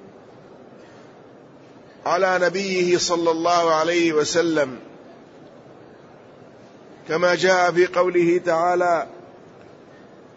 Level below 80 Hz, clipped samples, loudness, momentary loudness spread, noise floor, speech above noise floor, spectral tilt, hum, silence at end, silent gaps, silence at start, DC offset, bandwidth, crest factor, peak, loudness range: -66 dBFS; under 0.1%; -20 LUFS; 7 LU; -46 dBFS; 27 dB; -4 dB/octave; none; 1.1 s; none; 0 s; under 0.1%; 8 kHz; 16 dB; -6 dBFS; 5 LU